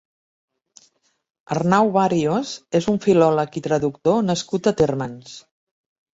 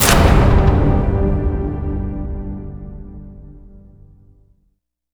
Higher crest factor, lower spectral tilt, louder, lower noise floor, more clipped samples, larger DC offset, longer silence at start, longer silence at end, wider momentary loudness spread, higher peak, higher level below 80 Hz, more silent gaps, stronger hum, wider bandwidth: about the same, 18 dB vs 16 dB; about the same, -6 dB/octave vs -5.5 dB/octave; second, -20 LUFS vs -17 LUFS; second, -61 dBFS vs -65 dBFS; neither; neither; first, 1.5 s vs 0 s; second, 0.75 s vs 1.35 s; second, 11 LU vs 23 LU; about the same, -2 dBFS vs 0 dBFS; second, -54 dBFS vs -20 dBFS; neither; neither; second, 8 kHz vs over 20 kHz